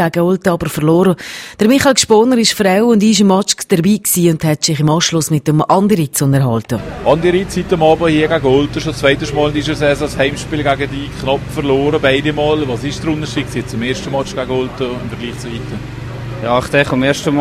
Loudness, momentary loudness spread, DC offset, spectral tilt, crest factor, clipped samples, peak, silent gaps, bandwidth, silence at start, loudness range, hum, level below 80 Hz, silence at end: -14 LUFS; 11 LU; under 0.1%; -5 dB/octave; 14 dB; under 0.1%; 0 dBFS; none; 16 kHz; 0 s; 7 LU; none; -36 dBFS; 0 s